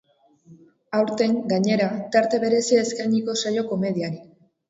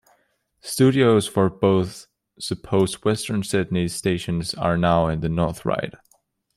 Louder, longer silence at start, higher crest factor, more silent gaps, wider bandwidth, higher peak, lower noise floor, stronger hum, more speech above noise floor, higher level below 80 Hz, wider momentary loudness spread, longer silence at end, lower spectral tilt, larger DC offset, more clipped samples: about the same, -22 LUFS vs -22 LUFS; second, 0.5 s vs 0.65 s; about the same, 16 dB vs 18 dB; neither; second, 8 kHz vs 14.5 kHz; about the same, -6 dBFS vs -4 dBFS; second, -53 dBFS vs -66 dBFS; neither; second, 32 dB vs 45 dB; second, -68 dBFS vs -48 dBFS; second, 7 LU vs 13 LU; second, 0.45 s vs 0.65 s; about the same, -5 dB/octave vs -6 dB/octave; neither; neither